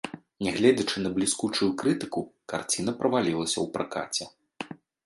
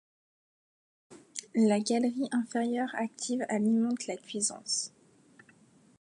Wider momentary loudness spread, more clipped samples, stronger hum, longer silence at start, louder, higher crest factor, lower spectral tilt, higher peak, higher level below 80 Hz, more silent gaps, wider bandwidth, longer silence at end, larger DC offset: first, 17 LU vs 9 LU; neither; neither; second, 0.05 s vs 1.1 s; first, -27 LUFS vs -31 LUFS; about the same, 20 dB vs 16 dB; about the same, -4 dB/octave vs -4 dB/octave; first, -8 dBFS vs -16 dBFS; first, -62 dBFS vs -82 dBFS; neither; about the same, 11.5 kHz vs 11.5 kHz; second, 0.3 s vs 1.15 s; neither